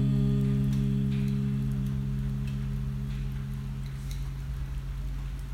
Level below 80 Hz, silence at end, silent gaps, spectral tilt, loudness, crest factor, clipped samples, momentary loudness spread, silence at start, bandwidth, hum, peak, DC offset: -36 dBFS; 0 s; none; -8.5 dB/octave; -31 LUFS; 12 dB; under 0.1%; 10 LU; 0 s; 13.5 kHz; none; -16 dBFS; under 0.1%